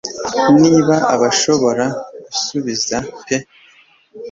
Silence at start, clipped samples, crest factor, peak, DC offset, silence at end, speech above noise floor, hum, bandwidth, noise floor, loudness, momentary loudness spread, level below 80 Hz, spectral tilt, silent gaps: 0.05 s; under 0.1%; 14 dB; -2 dBFS; under 0.1%; 0 s; 35 dB; none; 7.8 kHz; -50 dBFS; -15 LUFS; 12 LU; -52 dBFS; -4 dB/octave; none